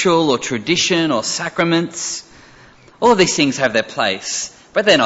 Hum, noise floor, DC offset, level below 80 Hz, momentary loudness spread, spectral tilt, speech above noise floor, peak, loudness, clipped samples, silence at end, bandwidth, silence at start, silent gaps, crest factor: none; -45 dBFS; under 0.1%; -54 dBFS; 9 LU; -3 dB/octave; 29 dB; -2 dBFS; -17 LUFS; under 0.1%; 0 s; 8.2 kHz; 0 s; none; 16 dB